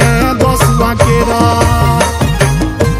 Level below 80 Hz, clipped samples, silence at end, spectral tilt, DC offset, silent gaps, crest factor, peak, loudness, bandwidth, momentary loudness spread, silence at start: -18 dBFS; 0.3%; 0 s; -5.5 dB/octave; under 0.1%; none; 10 dB; 0 dBFS; -11 LUFS; 16.5 kHz; 2 LU; 0 s